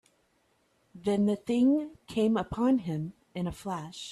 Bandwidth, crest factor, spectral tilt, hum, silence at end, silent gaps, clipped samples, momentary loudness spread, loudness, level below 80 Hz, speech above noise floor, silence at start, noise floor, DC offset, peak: 12.5 kHz; 14 dB; -7 dB/octave; none; 0 s; none; under 0.1%; 11 LU; -30 LUFS; -58 dBFS; 42 dB; 0.95 s; -71 dBFS; under 0.1%; -16 dBFS